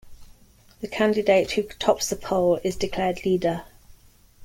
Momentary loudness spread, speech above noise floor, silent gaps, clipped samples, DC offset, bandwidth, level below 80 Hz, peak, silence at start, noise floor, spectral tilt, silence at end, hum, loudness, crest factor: 7 LU; 31 dB; none; under 0.1%; under 0.1%; 16.5 kHz; -48 dBFS; -4 dBFS; 0.05 s; -54 dBFS; -4.5 dB/octave; 0 s; none; -24 LUFS; 20 dB